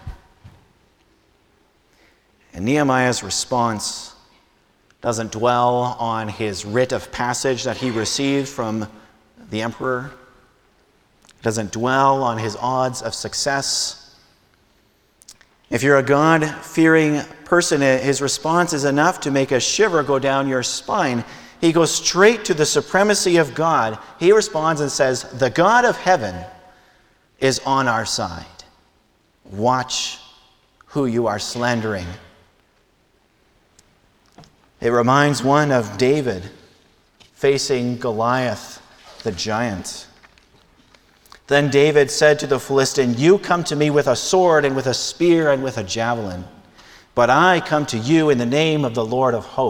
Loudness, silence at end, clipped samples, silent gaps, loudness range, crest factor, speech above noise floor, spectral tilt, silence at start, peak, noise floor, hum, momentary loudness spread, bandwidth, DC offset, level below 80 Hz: -18 LUFS; 0 s; under 0.1%; none; 8 LU; 20 dB; 42 dB; -4 dB/octave; 0.05 s; 0 dBFS; -60 dBFS; none; 12 LU; 18 kHz; under 0.1%; -52 dBFS